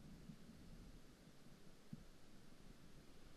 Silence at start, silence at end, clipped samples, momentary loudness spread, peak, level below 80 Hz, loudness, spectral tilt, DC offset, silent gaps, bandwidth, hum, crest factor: 0 s; 0 s; under 0.1%; 5 LU; -42 dBFS; -66 dBFS; -64 LUFS; -5.5 dB/octave; under 0.1%; none; 13 kHz; none; 18 dB